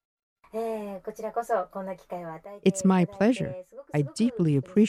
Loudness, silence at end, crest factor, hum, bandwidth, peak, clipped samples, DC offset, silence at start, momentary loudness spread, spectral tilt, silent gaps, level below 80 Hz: -28 LUFS; 0 s; 18 dB; none; 13 kHz; -10 dBFS; under 0.1%; under 0.1%; 0.55 s; 14 LU; -7 dB/octave; none; -64 dBFS